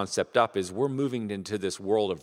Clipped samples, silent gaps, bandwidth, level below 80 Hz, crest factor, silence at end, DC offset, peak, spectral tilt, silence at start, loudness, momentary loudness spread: under 0.1%; none; 13.5 kHz; -68 dBFS; 22 dB; 0 s; under 0.1%; -6 dBFS; -5 dB/octave; 0 s; -28 LUFS; 7 LU